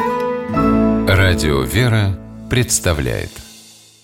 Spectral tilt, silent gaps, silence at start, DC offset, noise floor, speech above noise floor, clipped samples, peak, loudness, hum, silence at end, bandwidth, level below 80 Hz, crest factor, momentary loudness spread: -5 dB/octave; none; 0 s; under 0.1%; -43 dBFS; 27 dB; under 0.1%; -2 dBFS; -16 LUFS; none; 0.4 s; 17 kHz; -30 dBFS; 14 dB; 11 LU